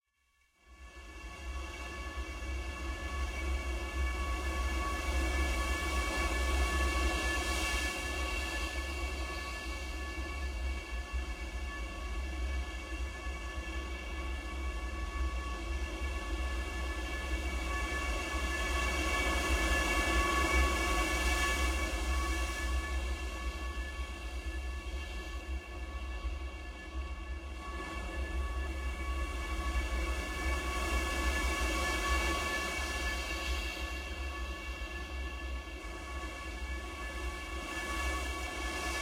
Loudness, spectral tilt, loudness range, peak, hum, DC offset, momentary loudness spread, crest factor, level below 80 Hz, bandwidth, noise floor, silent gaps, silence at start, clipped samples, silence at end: -36 LUFS; -4 dB/octave; 10 LU; -18 dBFS; none; under 0.1%; 10 LU; 18 dB; -38 dBFS; 16 kHz; -74 dBFS; none; 0.65 s; under 0.1%; 0 s